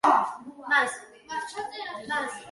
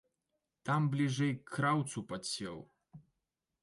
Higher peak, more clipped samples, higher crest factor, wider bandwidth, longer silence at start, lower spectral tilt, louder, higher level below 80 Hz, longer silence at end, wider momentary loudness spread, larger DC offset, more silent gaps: first, -8 dBFS vs -20 dBFS; neither; about the same, 20 dB vs 16 dB; about the same, 12 kHz vs 11.5 kHz; second, 0.05 s vs 0.65 s; second, -2 dB/octave vs -5.5 dB/octave; first, -28 LUFS vs -35 LUFS; about the same, -70 dBFS vs -74 dBFS; second, 0 s vs 0.65 s; about the same, 13 LU vs 12 LU; neither; neither